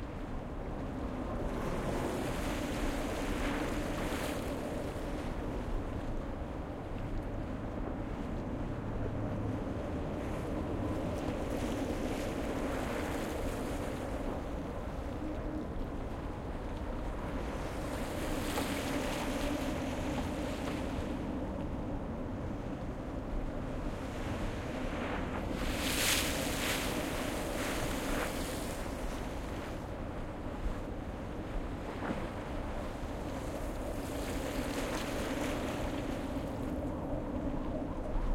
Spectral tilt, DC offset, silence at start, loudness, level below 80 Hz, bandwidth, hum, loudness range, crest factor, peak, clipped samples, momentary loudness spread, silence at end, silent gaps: -5 dB/octave; under 0.1%; 0 s; -38 LUFS; -42 dBFS; 16.5 kHz; none; 6 LU; 20 dB; -16 dBFS; under 0.1%; 6 LU; 0 s; none